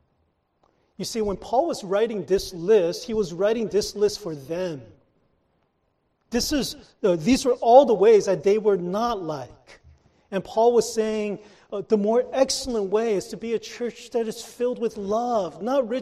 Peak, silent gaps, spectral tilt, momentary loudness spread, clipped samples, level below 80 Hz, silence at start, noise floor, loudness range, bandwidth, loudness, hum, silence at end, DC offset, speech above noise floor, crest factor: -2 dBFS; none; -4.5 dB/octave; 14 LU; under 0.1%; -52 dBFS; 1 s; -71 dBFS; 8 LU; 14 kHz; -23 LUFS; none; 0 s; under 0.1%; 48 dB; 22 dB